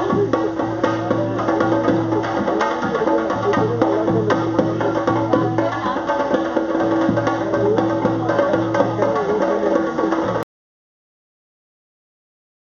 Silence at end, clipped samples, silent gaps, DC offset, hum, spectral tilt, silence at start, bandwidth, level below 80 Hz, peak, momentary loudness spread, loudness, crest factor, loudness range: 2.35 s; under 0.1%; none; under 0.1%; none; -6 dB/octave; 0 s; 7.2 kHz; -50 dBFS; 0 dBFS; 3 LU; -19 LUFS; 18 dB; 3 LU